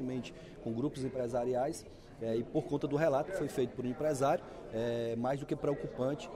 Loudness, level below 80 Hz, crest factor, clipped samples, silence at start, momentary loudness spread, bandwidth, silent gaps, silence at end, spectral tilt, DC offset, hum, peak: -35 LUFS; -60 dBFS; 16 dB; under 0.1%; 0 s; 10 LU; 16 kHz; none; 0 s; -6.5 dB/octave; under 0.1%; none; -18 dBFS